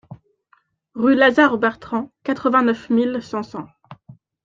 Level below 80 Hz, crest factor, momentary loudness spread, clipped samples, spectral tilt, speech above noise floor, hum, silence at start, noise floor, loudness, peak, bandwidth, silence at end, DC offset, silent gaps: -60 dBFS; 18 dB; 19 LU; under 0.1%; -6 dB/octave; 43 dB; none; 0.1 s; -61 dBFS; -18 LUFS; -2 dBFS; 7.4 kHz; 0.3 s; under 0.1%; none